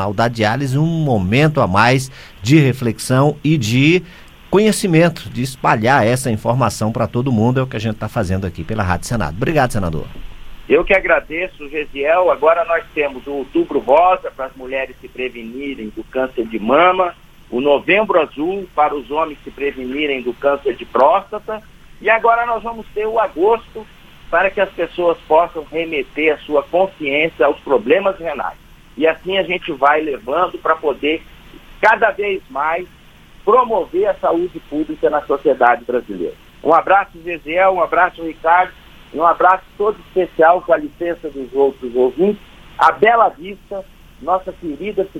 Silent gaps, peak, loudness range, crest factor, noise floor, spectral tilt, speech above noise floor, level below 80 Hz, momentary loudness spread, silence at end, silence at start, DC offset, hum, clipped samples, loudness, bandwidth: none; 0 dBFS; 3 LU; 16 dB; -42 dBFS; -6 dB/octave; 26 dB; -40 dBFS; 12 LU; 0 s; 0 s; under 0.1%; none; under 0.1%; -16 LUFS; 16 kHz